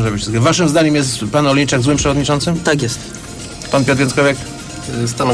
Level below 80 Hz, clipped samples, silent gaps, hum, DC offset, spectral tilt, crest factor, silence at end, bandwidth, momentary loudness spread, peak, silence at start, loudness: -36 dBFS; under 0.1%; none; none; under 0.1%; -4.5 dB/octave; 12 dB; 0 s; 11 kHz; 14 LU; -2 dBFS; 0 s; -15 LUFS